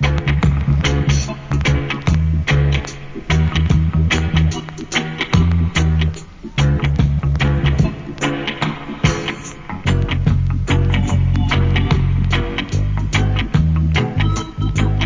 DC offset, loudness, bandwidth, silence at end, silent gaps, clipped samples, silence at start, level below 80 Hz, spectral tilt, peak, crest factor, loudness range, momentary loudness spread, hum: under 0.1%; -17 LUFS; 7.6 kHz; 0 s; none; under 0.1%; 0 s; -22 dBFS; -6 dB/octave; 0 dBFS; 16 dB; 2 LU; 6 LU; none